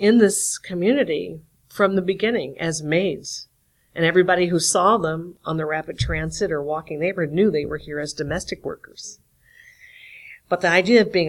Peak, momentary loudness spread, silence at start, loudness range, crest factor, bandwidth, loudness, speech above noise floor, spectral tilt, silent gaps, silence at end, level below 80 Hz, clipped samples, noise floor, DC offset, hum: -2 dBFS; 19 LU; 0 s; 5 LU; 18 dB; 15 kHz; -21 LUFS; 31 dB; -4.5 dB/octave; none; 0 s; -46 dBFS; under 0.1%; -52 dBFS; under 0.1%; none